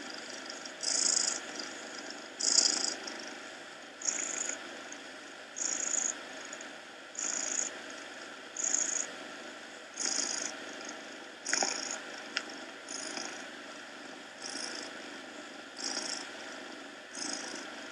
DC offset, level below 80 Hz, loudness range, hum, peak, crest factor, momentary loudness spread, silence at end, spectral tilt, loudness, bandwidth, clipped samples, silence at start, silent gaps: under 0.1%; under -90 dBFS; 9 LU; none; -10 dBFS; 28 dB; 16 LU; 0 s; 1 dB/octave; -34 LUFS; 15.5 kHz; under 0.1%; 0 s; none